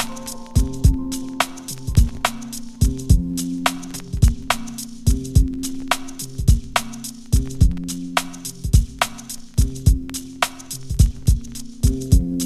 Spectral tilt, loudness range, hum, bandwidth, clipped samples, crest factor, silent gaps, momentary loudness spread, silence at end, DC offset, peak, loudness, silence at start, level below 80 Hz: -5 dB/octave; 1 LU; none; 15 kHz; under 0.1%; 18 dB; none; 12 LU; 0 s; under 0.1%; -2 dBFS; -22 LUFS; 0 s; -22 dBFS